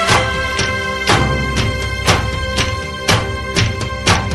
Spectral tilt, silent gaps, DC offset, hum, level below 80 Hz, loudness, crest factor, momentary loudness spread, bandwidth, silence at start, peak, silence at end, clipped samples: -3.5 dB/octave; none; under 0.1%; none; -26 dBFS; -16 LUFS; 16 dB; 5 LU; 13 kHz; 0 s; 0 dBFS; 0 s; under 0.1%